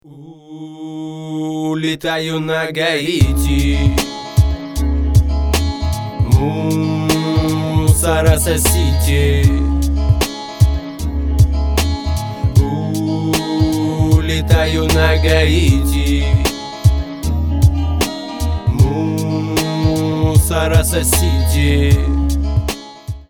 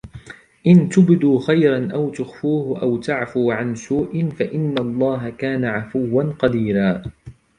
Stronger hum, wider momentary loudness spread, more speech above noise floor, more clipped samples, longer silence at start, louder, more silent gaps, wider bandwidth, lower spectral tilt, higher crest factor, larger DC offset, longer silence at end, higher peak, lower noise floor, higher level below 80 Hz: neither; about the same, 8 LU vs 10 LU; about the same, 24 dB vs 22 dB; neither; about the same, 0.1 s vs 0.05 s; first, -15 LUFS vs -19 LUFS; neither; first, 19.5 kHz vs 9.8 kHz; second, -5.5 dB/octave vs -8 dB/octave; about the same, 14 dB vs 16 dB; neither; second, 0.05 s vs 0.25 s; about the same, 0 dBFS vs -2 dBFS; about the same, -38 dBFS vs -40 dBFS; first, -20 dBFS vs -50 dBFS